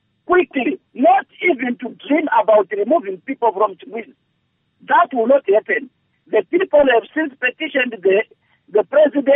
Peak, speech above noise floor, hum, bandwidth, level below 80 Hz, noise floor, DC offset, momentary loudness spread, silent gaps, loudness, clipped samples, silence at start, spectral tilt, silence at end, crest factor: -4 dBFS; 51 dB; none; 3.8 kHz; -60 dBFS; -67 dBFS; under 0.1%; 9 LU; none; -17 LUFS; under 0.1%; 0.3 s; -2 dB/octave; 0 s; 14 dB